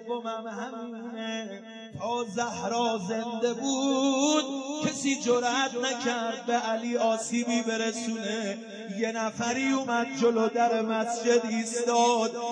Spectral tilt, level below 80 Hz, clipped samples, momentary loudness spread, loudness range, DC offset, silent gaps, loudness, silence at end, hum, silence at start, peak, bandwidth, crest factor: -3 dB/octave; -78 dBFS; under 0.1%; 11 LU; 4 LU; under 0.1%; none; -28 LUFS; 0 s; none; 0 s; -12 dBFS; 10.5 kHz; 16 dB